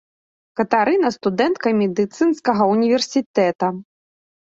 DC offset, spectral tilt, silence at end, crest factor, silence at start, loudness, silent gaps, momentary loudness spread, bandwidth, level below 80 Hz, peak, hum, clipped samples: under 0.1%; -5.5 dB/octave; 0.6 s; 16 dB; 0.6 s; -19 LUFS; 3.26-3.34 s, 3.55-3.59 s; 7 LU; 8.2 kHz; -64 dBFS; -2 dBFS; none; under 0.1%